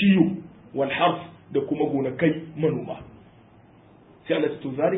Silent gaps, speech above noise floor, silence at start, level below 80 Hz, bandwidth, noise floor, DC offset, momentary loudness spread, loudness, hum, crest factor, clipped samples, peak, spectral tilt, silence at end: none; 28 dB; 0 s; -60 dBFS; 4 kHz; -52 dBFS; under 0.1%; 14 LU; -25 LUFS; none; 20 dB; under 0.1%; -6 dBFS; -11.5 dB/octave; 0 s